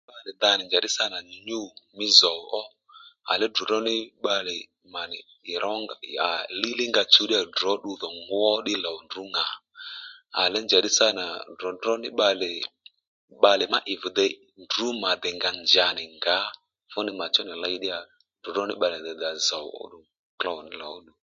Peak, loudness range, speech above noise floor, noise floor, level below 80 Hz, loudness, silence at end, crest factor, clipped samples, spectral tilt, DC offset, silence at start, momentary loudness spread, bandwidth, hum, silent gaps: 0 dBFS; 5 LU; 27 dB; -52 dBFS; -72 dBFS; -24 LUFS; 0.2 s; 26 dB; under 0.1%; -1 dB/octave; under 0.1%; 0.15 s; 17 LU; 9.4 kHz; none; 13.07-13.28 s, 20.19-20.38 s